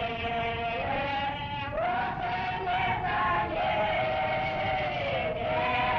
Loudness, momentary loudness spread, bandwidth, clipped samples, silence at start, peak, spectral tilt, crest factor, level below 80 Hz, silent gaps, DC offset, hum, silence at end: -29 LUFS; 4 LU; 6.6 kHz; under 0.1%; 0 s; -16 dBFS; -2.5 dB/octave; 12 dB; -48 dBFS; none; under 0.1%; none; 0 s